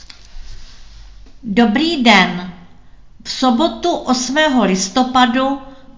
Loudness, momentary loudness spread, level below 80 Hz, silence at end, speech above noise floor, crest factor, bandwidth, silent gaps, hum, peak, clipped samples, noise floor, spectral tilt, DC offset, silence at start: -14 LUFS; 16 LU; -42 dBFS; 0.05 s; 29 dB; 16 dB; 7.6 kHz; none; none; 0 dBFS; under 0.1%; -43 dBFS; -4 dB/octave; 0.8%; 0.35 s